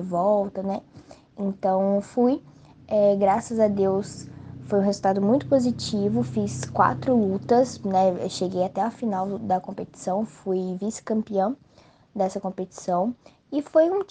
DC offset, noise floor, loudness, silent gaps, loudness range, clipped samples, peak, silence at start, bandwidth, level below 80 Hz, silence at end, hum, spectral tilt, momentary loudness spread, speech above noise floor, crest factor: under 0.1%; -56 dBFS; -24 LUFS; none; 5 LU; under 0.1%; -4 dBFS; 0 s; 9.6 kHz; -62 dBFS; 0.05 s; none; -6.5 dB/octave; 10 LU; 32 dB; 20 dB